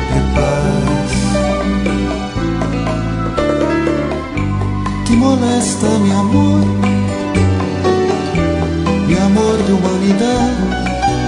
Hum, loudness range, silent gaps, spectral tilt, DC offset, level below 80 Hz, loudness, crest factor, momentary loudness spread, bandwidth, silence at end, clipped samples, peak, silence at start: none; 3 LU; none; -6 dB/octave; under 0.1%; -26 dBFS; -15 LUFS; 14 dB; 6 LU; 11 kHz; 0 s; under 0.1%; 0 dBFS; 0 s